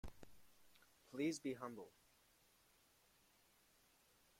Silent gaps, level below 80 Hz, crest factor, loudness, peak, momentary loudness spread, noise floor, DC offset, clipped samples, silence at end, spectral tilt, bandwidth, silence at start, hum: none; -72 dBFS; 22 dB; -47 LUFS; -32 dBFS; 23 LU; -75 dBFS; under 0.1%; under 0.1%; 2.5 s; -4.5 dB/octave; 16.5 kHz; 0.05 s; none